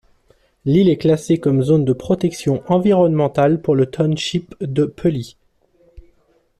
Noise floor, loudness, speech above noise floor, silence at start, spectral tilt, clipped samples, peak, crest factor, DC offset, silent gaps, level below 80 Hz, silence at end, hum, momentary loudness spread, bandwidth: -58 dBFS; -17 LUFS; 42 dB; 0.65 s; -7.5 dB/octave; under 0.1%; -4 dBFS; 14 dB; under 0.1%; none; -50 dBFS; 0.6 s; none; 8 LU; 13 kHz